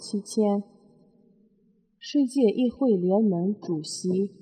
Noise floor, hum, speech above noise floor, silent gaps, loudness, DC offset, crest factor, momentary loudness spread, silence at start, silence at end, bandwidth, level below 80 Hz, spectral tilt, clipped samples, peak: -65 dBFS; none; 40 dB; none; -25 LUFS; under 0.1%; 16 dB; 8 LU; 0 s; 0.15 s; 9.8 kHz; -72 dBFS; -6.5 dB/octave; under 0.1%; -10 dBFS